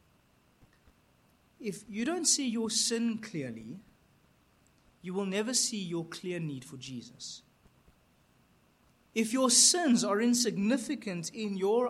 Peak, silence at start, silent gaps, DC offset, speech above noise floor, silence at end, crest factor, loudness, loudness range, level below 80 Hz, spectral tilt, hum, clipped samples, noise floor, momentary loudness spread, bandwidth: -10 dBFS; 1.6 s; none; under 0.1%; 36 dB; 0 s; 22 dB; -29 LUFS; 10 LU; -72 dBFS; -2.5 dB/octave; none; under 0.1%; -67 dBFS; 20 LU; 15.5 kHz